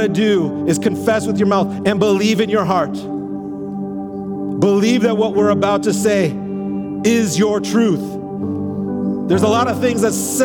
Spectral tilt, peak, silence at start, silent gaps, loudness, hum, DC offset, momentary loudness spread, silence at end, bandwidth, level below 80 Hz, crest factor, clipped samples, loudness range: -5.5 dB/octave; -2 dBFS; 0 s; none; -17 LUFS; none; under 0.1%; 10 LU; 0 s; 18.5 kHz; -54 dBFS; 16 dB; under 0.1%; 2 LU